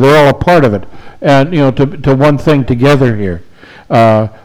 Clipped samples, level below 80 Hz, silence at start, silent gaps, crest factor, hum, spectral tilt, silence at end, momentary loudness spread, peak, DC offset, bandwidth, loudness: under 0.1%; -32 dBFS; 0 s; none; 8 dB; none; -7.5 dB/octave; 0.1 s; 9 LU; 0 dBFS; under 0.1%; 19.5 kHz; -9 LUFS